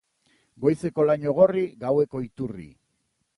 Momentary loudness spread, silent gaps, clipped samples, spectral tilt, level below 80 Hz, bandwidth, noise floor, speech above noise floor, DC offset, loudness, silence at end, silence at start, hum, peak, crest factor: 14 LU; none; under 0.1%; -8.5 dB/octave; -60 dBFS; 11.5 kHz; -74 dBFS; 51 dB; under 0.1%; -24 LUFS; 0.7 s; 0.6 s; none; -6 dBFS; 18 dB